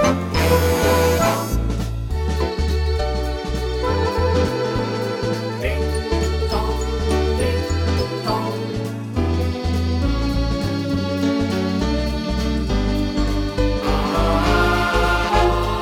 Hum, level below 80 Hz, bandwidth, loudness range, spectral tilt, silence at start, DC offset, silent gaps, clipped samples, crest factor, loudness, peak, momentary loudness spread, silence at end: none; -24 dBFS; 17.5 kHz; 2 LU; -6 dB/octave; 0 s; under 0.1%; none; under 0.1%; 16 dB; -20 LUFS; -4 dBFS; 6 LU; 0 s